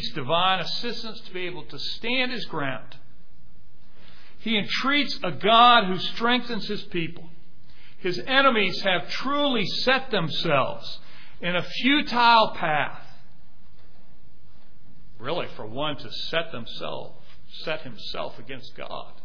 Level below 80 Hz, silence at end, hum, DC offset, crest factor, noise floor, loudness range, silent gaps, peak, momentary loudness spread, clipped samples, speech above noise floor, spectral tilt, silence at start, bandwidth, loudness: -54 dBFS; 0.15 s; none; 4%; 22 dB; -55 dBFS; 11 LU; none; -4 dBFS; 17 LU; under 0.1%; 31 dB; -5 dB/octave; 0 s; 5.4 kHz; -24 LUFS